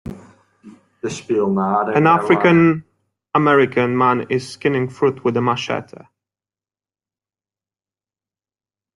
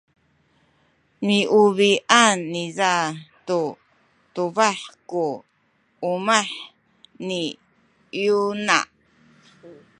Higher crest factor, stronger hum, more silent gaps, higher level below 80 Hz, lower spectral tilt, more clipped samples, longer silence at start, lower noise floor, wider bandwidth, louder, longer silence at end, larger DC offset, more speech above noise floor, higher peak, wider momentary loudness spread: about the same, 18 dB vs 22 dB; neither; neither; first, -56 dBFS vs -72 dBFS; first, -6.5 dB/octave vs -3 dB/octave; neither; second, 0.05 s vs 1.2 s; first, under -90 dBFS vs -65 dBFS; about the same, 11.5 kHz vs 11 kHz; first, -17 LUFS vs -21 LUFS; first, 3.1 s vs 0.25 s; neither; first, over 73 dB vs 44 dB; about the same, -2 dBFS vs 0 dBFS; second, 13 LU vs 18 LU